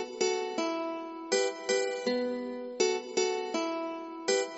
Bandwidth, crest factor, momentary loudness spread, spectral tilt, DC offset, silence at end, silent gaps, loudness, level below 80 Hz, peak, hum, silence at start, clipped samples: 8 kHz; 18 dB; 7 LU; -1 dB/octave; under 0.1%; 0 s; none; -32 LUFS; -78 dBFS; -14 dBFS; none; 0 s; under 0.1%